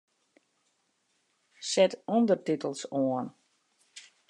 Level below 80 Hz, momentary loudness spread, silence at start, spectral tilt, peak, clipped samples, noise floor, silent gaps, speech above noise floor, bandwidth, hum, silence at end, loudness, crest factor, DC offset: -88 dBFS; 16 LU; 1.6 s; -4.5 dB/octave; -10 dBFS; under 0.1%; -75 dBFS; none; 47 dB; 10.5 kHz; none; 0.3 s; -29 LUFS; 22 dB; under 0.1%